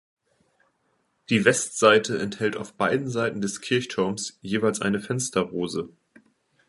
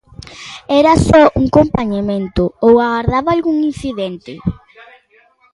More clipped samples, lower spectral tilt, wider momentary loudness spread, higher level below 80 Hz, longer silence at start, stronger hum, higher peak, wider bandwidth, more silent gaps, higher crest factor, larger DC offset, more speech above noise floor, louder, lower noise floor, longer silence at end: neither; second, -4 dB/octave vs -7 dB/octave; second, 10 LU vs 15 LU; second, -62 dBFS vs -32 dBFS; first, 1.3 s vs 0.3 s; neither; about the same, -2 dBFS vs 0 dBFS; about the same, 11.5 kHz vs 11.5 kHz; neither; first, 24 dB vs 14 dB; neither; first, 46 dB vs 39 dB; second, -24 LUFS vs -14 LUFS; first, -71 dBFS vs -52 dBFS; second, 0.8 s vs 1 s